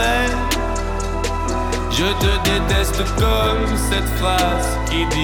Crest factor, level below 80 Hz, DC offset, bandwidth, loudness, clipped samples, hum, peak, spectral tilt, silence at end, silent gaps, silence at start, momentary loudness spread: 12 dB; -22 dBFS; under 0.1%; 19.5 kHz; -19 LUFS; under 0.1%; none; -6 dBFS; -4.5 dB/octave; 0 s; none; 0 s; 5 LU